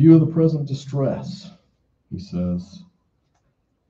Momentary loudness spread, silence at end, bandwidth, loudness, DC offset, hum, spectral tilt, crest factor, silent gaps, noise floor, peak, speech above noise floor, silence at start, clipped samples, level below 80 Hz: 22 LU; 1.1 s; 7.4 kHz; -21 LUFS; under 0.1%; none; -9.5 dB/octave; 20 dB; none; -68 dBFS; -2 dBFS; 49 dB; 0 s; under 0.1%; -54 dBFS